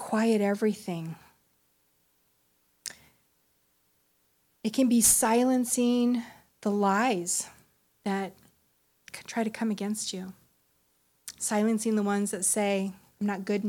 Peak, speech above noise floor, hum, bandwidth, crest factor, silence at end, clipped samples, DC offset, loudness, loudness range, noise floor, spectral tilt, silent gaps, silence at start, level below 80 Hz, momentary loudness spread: -10 dBFS; 44 dB; none; 18.5 kHz; 18 dB; 0 s; under 0.1%; under 0.1%; -27 LUFS; 11 LU; -70 dBFS; -4 dB/octave; none; 0 s; -66 dBFS; 18 LU